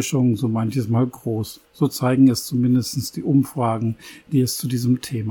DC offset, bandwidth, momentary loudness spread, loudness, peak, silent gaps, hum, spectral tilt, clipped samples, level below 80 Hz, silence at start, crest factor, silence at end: under 0.1%; 18.5 kHz; 10 LU; -21 LUFS; -4 dBFS; none; none; -6.5 dB/octave; under 0.1%; -58 dBFS; 0 s; 16 dB; 0 s